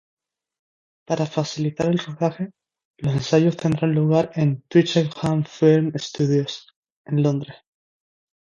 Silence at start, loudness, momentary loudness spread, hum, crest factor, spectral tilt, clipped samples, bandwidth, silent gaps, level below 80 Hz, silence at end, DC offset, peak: 1.1 s; -21 LUFS; 11 LU; none; 20 dB; -7 dB/octave; under 0.1%; 7.6 kHz; 2.85-2.94 s, 6.76-6.83 s, 6.90-7.04 s; -58 dBFS; 0.9 s; under 0.1%; -2 dBFS